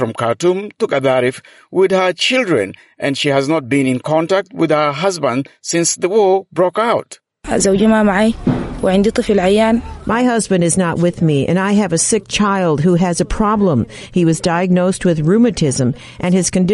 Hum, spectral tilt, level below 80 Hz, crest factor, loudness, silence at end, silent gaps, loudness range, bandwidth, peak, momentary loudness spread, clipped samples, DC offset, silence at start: none; -5 dB/octave; -38 dBFS; 12 dB; -15 LUFS; 0 s; none; 2 LU; 11.5 kHz; -2 dBFS; 6 LU; under 0.1%; under 0.1%; 0 s